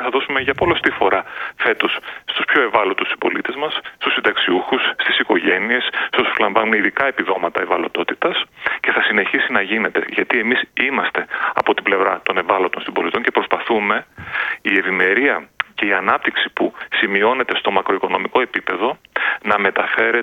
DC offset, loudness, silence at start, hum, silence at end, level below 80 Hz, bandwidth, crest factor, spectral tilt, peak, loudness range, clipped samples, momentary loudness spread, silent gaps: under 0.1%; -17 LUFS; 0 s; none; 0 s; -56 dBFS; 14.5 kHz; 18 dB; -5.5 dB/octave; 0 dBFS; 1 LU; under 0.1%; 6 LU; none